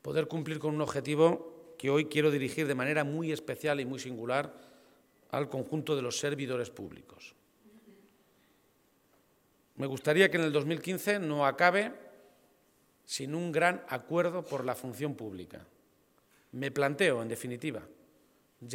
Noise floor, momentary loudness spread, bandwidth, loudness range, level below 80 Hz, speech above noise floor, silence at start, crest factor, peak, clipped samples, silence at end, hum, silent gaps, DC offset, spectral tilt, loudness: -69 dBFS; 16 LU; 16.5 kHz; 8 LU; -76 dBFS; 38 dB; 0.05 s; 24 dB; -8 dBFS; under 0.1%; 0 s; none; none; under 0.1%; -5 dB/octave; -31 LUFS